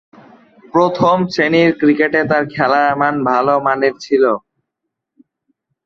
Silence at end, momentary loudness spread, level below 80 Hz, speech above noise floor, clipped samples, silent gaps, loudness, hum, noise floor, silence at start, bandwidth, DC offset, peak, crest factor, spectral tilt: 1.45 s; 4 LU; -56 dBFS; 64 dB; under 0.1%; none; -14 LUFS; none; -78 dBFS; 0.75 s; 7.4 kHz; under 0.1%; 0 dBFS; 14 dB; -6.5 dB/octave